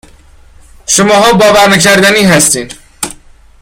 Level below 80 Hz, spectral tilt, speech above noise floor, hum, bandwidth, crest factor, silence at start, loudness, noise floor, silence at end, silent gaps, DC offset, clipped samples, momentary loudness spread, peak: -38 dBFS; -3 dB/octave; 32 dB; none; over 20 kHz; 8 dB; 0.9 s; -6 LUFS; -38 dBFS; 0.45 s; none; under 0.1%; 0.5%; 15 LU; 0 dBFS